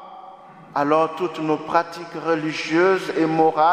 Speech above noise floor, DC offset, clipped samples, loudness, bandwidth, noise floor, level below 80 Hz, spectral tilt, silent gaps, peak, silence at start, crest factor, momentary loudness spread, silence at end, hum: 23 dB; under 0.1%; under 0.1%; -21 LUFS; 14 kHz; -42 dBFS; -68 dBFS; -6 dB/octave; none; -2 dBFS; 0 s; 18 dB; 11 LU; 0 s; none